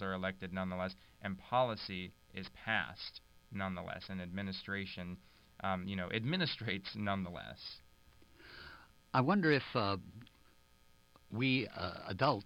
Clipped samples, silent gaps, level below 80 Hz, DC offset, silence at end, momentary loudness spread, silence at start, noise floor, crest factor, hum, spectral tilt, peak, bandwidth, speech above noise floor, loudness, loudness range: under 0.1%; none; -68 dBFS; under 0.1%; 0 s; 16 LU; 0 s; -66 dBFS; 20 dB; none; -7 dB/octave; -18 dBFS; 16 kHz; 28 dB; -38 LUFS; 5 LU